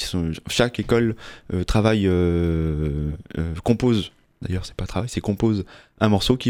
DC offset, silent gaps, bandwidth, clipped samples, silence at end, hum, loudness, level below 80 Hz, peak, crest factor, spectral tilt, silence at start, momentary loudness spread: under 0.1%; none; 16 kHz; under 0.1%; 0 s; none; -23 LUFS; -34 dBFS; -2 dBFS; 20 dB; -6 dB/octave; 0 s; 10 LU